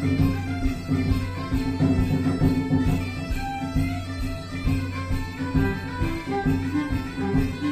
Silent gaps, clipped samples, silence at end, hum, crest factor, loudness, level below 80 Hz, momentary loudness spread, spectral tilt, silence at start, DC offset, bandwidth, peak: none; under 0.1%; 0 s; none; 16 dB; -26 LUFS; -32 dBFS; 7 LU; -7.5 dB/octave; 0 s; 0.1%; 15 kHz; -8 dBFS